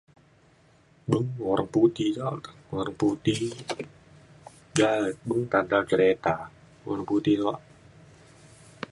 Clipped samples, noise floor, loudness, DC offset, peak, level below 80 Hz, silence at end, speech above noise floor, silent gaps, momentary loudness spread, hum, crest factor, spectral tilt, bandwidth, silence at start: under 0.1%; -59 dBFS; -26 LUFS; under 0.1%; -6 dBFS; -60 dBFS; 0.05 s; 34 dB; none; 15 LU; none; 20 dB; -6 dB/octave; 11.5 kHz; 1.05 s